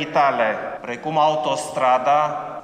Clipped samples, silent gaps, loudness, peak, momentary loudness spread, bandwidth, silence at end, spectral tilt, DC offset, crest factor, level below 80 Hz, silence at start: under 0.1%; none; -20 LUFS; -6 dBFS; 10 LU; 13 kHz; 0 s; -4 dB/octave; under 0.1%; 14 dB; -64 dBFS; 0 s